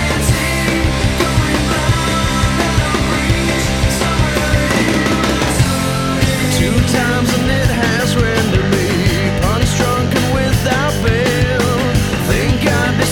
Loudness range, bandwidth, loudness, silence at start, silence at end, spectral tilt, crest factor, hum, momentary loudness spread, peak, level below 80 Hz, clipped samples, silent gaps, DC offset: 1 LU; 18.5 kHz; -14 LUFS; 0 s; 0 s; -5 dB/octave; 14 dB; none; 1 LU; 0 dBFS; -24 dBFS; under 0.1%; none; under 0.1%